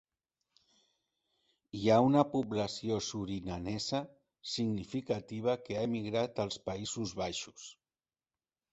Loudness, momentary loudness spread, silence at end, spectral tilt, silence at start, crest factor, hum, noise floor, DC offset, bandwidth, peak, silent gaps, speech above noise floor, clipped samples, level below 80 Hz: -34 LUFS; 13 LU; 1 s; -5.5 dB/octave; 1.75 s; 24 dB; none; under -90 dBFS; under 0.1%; 8.2 kHz; -12 dBFS; none; over 56 dB; under 0.1%; -62 dBFS